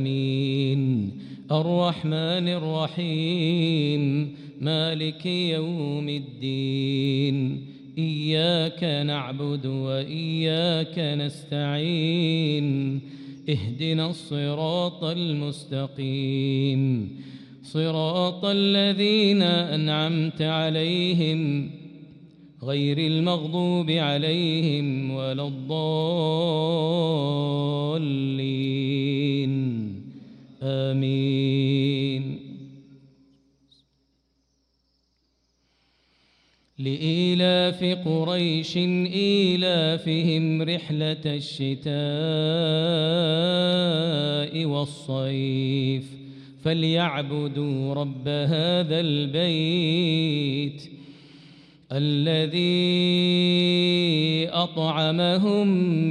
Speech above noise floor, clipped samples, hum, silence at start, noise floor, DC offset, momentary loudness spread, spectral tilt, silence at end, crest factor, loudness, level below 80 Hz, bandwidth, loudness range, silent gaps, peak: 47 dB; under 0.1%; none; 0 s; -70 dBFS; under 0.1%; 9 LU; -7 dB/octave; 0 s; 16 dB; -24 LUFS; -68 dBFS; 10 kHz; 5 LU; none; -10 dBFS